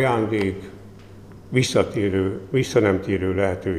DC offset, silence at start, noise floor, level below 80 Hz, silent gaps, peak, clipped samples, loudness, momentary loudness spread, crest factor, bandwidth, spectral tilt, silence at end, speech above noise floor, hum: 0.1%; 0 s; -42 dBFS; -50 dBFS; none; -4 dBFS; under 0.1%; -22 LUFS; 6 LU; 18 dB; 15 kHz; -6 dB/octave; 0 s; 21 dB; none